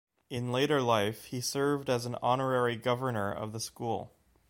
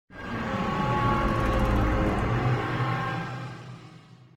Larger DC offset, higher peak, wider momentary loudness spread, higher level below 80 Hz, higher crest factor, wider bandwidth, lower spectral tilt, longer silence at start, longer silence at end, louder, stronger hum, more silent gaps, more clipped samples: neither; about the same, -12 dBFS vs -12 dBFS; second, 10 LU vs 13 LU; second, -66 dBFS vs -34 dBFS; about the same, 18 dB vs 14 dB; first, 16.5 kHz vs 13.5 kHz; second, -5 dB/octave vs -7 dB/octave; first, 0.3 s vs 0.1 s; first, 0.45 s vs 0.2 s; second, -31 LUFS vs -27 LUFS; neither; neither; neither